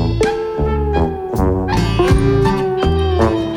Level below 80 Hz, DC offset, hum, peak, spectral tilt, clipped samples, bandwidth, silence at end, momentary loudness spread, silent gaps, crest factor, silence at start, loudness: -22 dBFS; under 0.1%; none; -2 dBFS; -7 dB/octave; under 0.1%; 16.5 kHz; 0 s; 5 LU; none; 14 dB; 0 s; -16 LUFS